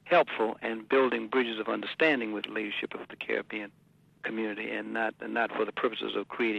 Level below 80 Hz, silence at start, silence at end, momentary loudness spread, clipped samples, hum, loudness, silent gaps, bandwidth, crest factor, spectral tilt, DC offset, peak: -76 dBFS; 0.05 s; 0 s; 11 LU; under 0.1%; none; -30 LUFS; none; 8.8 kHz; 20 dB; -6 dB/octave; under 0.1%; -12 dBFS